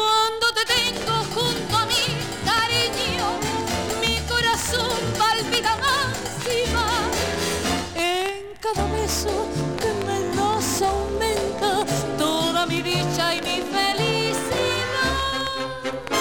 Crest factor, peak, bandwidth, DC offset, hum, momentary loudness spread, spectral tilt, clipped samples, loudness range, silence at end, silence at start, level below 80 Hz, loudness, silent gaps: 16 dB; -6 dBFS; 19.5 kHz; 0.4%; none; 5 LU; -3 dB/octave; under 0.1%; 2 LU; 0 s; 0 s; -40 dBFS; -22 LUFS; none